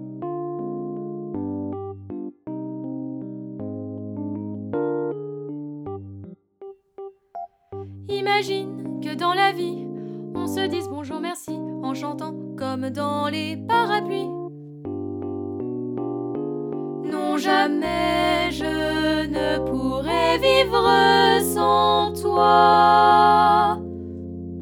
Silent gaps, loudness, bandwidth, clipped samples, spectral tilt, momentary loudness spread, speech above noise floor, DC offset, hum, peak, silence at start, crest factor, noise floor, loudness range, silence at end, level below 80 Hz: none; -22 LUFS; 19.5 kHz; under 0.1%; -5 dB/octave; 18 LU; 23 dB; under 0.1%; none; -2 dBFS; 0 s; 20 dB; -43 dBFS; 15 LU; 0 s; -48 dBFS